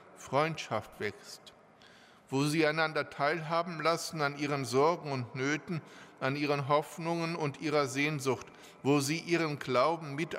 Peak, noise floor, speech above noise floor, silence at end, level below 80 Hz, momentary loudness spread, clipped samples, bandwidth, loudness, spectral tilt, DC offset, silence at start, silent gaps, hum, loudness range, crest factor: -14 dBFS; -58 dBFS; 26 dB; 0 s; -74 dBFS; 10 LU; under 0.1%; 16 kHz; -32 LUFS; -5 dB/octave; under 0.1%; 0 s; none; none; 2 LU; 18 dB